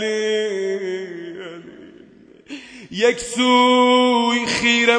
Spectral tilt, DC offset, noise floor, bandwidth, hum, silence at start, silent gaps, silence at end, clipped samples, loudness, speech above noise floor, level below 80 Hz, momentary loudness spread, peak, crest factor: -3 dB/octave; under 0.1%; -47 dBFS; 10 kHz; none; 0 s; none; 0 s; under 0.1%; -17 LUFS; 31 dB; -58 dBFS; 22 LU; -2 dBFS; 16 dB